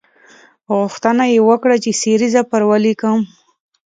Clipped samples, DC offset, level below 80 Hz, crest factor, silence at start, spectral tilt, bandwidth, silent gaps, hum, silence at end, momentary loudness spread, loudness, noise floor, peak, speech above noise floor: under 0.1%; under 0.1%; -64 dBFS; 14 dB; 0.7 s; -4.5 dB/octave; 9.4 kHz; none; none; 0.6 s; 7 LU; -14 LUFS; -47 dBFS; 0 dBFS; 33 dB